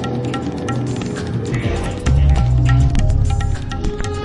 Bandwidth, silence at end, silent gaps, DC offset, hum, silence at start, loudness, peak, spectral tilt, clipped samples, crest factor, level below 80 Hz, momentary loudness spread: 11 kHz; 0 s; none; under 0.1%; none; 0 s; -18 LUFS; -4 dBFS; -7 dB/octave; under 0.1%; 12 dB; -20 dBFS; 8 LU